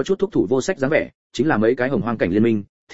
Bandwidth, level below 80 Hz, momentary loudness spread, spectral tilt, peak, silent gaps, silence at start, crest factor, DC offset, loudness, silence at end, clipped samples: 8 kHz; -50 dBFS; 5 LU; -6.5 dB/octave; -2 dBFS; 1.15-1.30 s, 2.69-2.87 s; 0 s; 16 dB; 1%; -20 LUFS; 0 s; under 0.1%